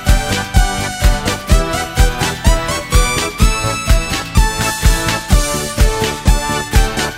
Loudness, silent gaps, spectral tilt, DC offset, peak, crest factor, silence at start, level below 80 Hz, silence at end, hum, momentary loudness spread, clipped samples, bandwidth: -15 LUFS; none; -4 dB/octave; under 0.1%; 0 dBFS; 14 dB; 0 s; -16 dBFS; 0 s; none; 2 LU; under 0.1%; 16.5 kHz